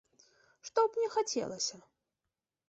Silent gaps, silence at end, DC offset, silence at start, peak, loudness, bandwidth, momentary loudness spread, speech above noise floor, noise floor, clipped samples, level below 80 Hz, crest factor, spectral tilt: none; 0.9 s; under 0.1%; 0.65 s; -16 dBFS; -33 LUFS; 8.2 kHz; 6 LU; 56 dB; -90 dBFS; under 0.1%; -80 dBFS; 20 dB; -2 dB/octave